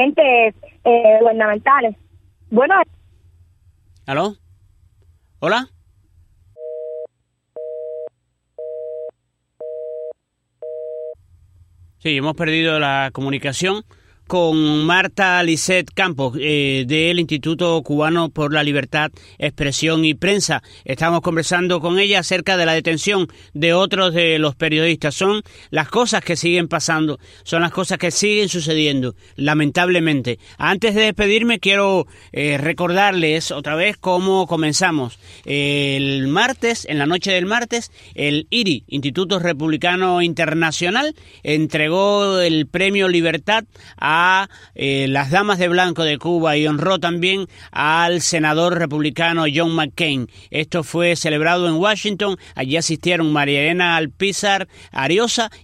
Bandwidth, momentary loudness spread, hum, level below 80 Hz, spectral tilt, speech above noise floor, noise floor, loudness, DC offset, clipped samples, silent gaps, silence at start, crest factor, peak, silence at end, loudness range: 15 kHz; 13 LU; none; -52 dBFS; -4 dB/octave; 53 dB; -70 dBFS; -17 LUFS; under 0.1%; under 0.1%; none; 0 s; 18 dB; 0 dBFS; 0.1 s; 10 LU